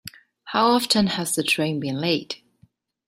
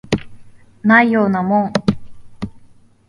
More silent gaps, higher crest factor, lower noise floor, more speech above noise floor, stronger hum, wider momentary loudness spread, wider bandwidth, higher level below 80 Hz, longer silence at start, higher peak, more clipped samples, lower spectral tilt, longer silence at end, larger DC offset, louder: neither; about the same, 18 dB vs 18 dB; first, -60 dBFS vs -46 dBFS; first, 38 dB vs 32 dB; neither; second, 15 LU vs 20 LU; first, 16 kHz vs 10.5 kHz; second, -60 dBFS vs -44 dBFS; about the same, 0.05 s vs 0.1 s; second, -6 dBFS vs 0 dBFS; neither; second, -3.5 dB/octave vs -7 dB/octave; first, 0.7 s vs 0.5 s; neither; second, -22 LUFS vs -15 LUFS